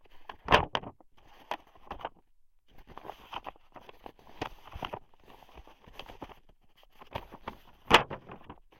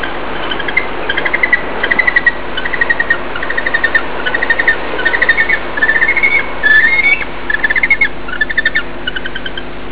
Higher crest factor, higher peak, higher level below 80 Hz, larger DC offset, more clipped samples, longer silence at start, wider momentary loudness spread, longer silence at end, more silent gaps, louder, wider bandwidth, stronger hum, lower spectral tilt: first, 30 dB vs 14 dB; second, -6 dBFS vs 0 dBFS; second, -52 dBFS vs -36 dBFS; second, under 0.1% vs 10%; neither; first, 0.15 s vs 0 s; first, 27 LU vs 11 LU; first, 0.25 s vs 0 s; neither; second, -31 LUFS vs -12 LUFS; first, 16.5 kHz vs 4 kHz; neither; second, -4 dB/octave vs -6 dB/octave